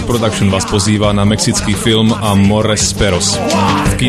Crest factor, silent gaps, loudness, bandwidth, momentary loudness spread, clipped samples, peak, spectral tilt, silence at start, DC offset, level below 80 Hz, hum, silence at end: 12 dB; none; -12 LUFS; 13 kHz; 2 LU; under 0.1%; 0 dBFS; -4.5 dB/octave; 0 s; under 0.1%; -28 dBFS; none; 0 s